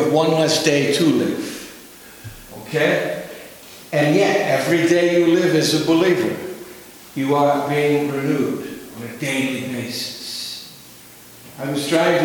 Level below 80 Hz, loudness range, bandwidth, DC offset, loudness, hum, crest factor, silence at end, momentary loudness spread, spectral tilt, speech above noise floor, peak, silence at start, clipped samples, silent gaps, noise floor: -58 dBFS; 7 LU; 19.5 kHz; under 0.1%; -19 LUFS; none; 20 dB; 0 s; 21 LU; -4.5 dB/octave; 25 dB; 0 dBFS; 0 s; under 0.1%; none; -43 dBFS